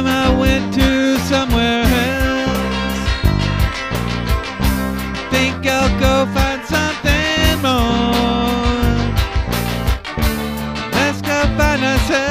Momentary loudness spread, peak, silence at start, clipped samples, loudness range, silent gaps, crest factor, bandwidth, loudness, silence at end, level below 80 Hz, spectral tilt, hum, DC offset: 5 LU; 0 dBFS; 0 s; under 0.1%; 3 LU; none; 16 dB; 15.5 kHz; -16 LUFS; 0 s; -22 dBFS; -5 dB/octave; none; 0.3%